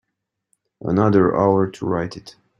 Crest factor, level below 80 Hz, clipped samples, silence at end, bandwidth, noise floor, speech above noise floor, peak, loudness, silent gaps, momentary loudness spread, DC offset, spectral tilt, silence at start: 18 dB; -54 dBFS; under 0.1%; 0.3 s; 10 kHz; -79 dBFS; 61 dB; -2 dBFS; -19 LUFS; none; 15 LU; under 0.1%; -8.5 dB/octave; 0.85 s